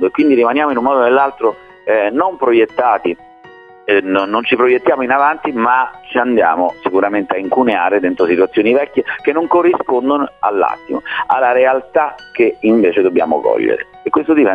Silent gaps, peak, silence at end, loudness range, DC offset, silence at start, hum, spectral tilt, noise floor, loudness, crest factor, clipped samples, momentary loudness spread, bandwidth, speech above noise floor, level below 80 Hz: none; 0 dBFS; 0 s; 1 LU; under 0.1%; 0 s; none; -7.5 dB/octave; -39 dBFS; -14 LUFS; 12 dB; under 0.1%; 6 LU; 4.9 kHz; 26 dB; -56 dBFS